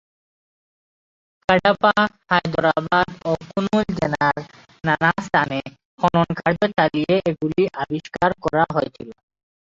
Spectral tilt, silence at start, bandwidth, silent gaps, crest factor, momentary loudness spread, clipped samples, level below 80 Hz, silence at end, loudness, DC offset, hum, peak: -6.5 dB/octave; 1.5 s; 7.8 kHz; 5.85-5.98 s; 18 dB; 10 LU; under 0.1%; -50 dBFS; 0.5 s; -20 LUFS; under 0.1%; none; -2 dBFS